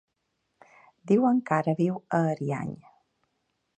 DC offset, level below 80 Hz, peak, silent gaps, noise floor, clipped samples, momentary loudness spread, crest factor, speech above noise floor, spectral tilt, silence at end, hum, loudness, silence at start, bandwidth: under 0.1%; -70 dBFS; -10 dBFS; none; -78 dBFS; under 0.1%; 12 LU; 20 dB; 53 dB; -8.5 dB/octave; 1.05 s; none; -26 LUFS; 1.05 s; 9 kHz